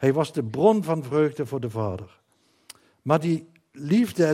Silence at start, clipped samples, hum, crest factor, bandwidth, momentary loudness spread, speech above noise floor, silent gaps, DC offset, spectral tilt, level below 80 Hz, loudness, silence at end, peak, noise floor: 0 s; under 0.1%; none; 18 dB; 16 kHz; 11 LU; 29 dB; none; under 0.1%; -7.5 dB/octave; -66 dBFS; -24 LUFS; 0 s; -6 dBFS; -52 dBFS